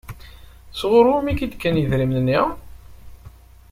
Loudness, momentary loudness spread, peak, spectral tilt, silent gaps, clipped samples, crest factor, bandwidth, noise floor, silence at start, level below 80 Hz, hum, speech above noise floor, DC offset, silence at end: -19 LUFS; 23 LU; -2 dBFS; -7.5 dB/octave; none; under 0.1%; 18 dB; 16 kHz; -44 dBFS; 0.05 s; -40 dBFS; none; 26 dB; under 0.1%; 0.4 s